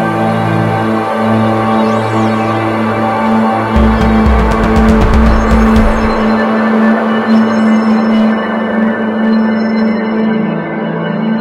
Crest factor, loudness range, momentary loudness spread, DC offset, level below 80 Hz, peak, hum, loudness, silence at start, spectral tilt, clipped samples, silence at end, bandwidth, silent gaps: 10 dB; 2 LU; 4 LU; under 0.1%; -20 dBFS; 0 dBFS; none; -11 LUFS; 0 s; -7.5 dB/octave; 0.1%; 0 s; 10.5 kHz; none